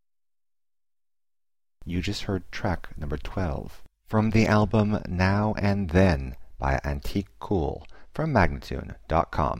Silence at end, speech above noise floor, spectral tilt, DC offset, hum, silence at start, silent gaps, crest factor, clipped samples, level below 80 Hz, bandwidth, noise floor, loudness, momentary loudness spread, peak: 0 s; over 65 dB; -7 dB/octave; under 0.1%; none; 1.8 s; none; 18 dB; under 0.1%; -38 dBFS; 15.5 kHz; under -90 dBFS; -26 LUFS; 14 LU; -8 dBFS